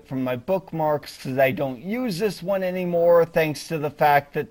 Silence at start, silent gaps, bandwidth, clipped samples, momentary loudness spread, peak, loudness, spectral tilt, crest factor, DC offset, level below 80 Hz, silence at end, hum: 0.1 s; none; 16.5 kHz; under 0.1%; 10 LU; -6 dBFS; -23 LUFS; -6 dB/octave; 16 dB; under 0.1%; -56 dBFS; 0.05 s; none